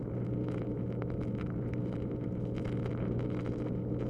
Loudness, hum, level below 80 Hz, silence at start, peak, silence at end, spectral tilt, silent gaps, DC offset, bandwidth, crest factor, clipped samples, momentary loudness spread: -36 LUFS; none; -48 dBFS; 0 s; -20 dBFS; 0 s; -10 dB/octave; none; under 0.1%; 5.2 kHz; 16 dB; under 0.1%; 2 LU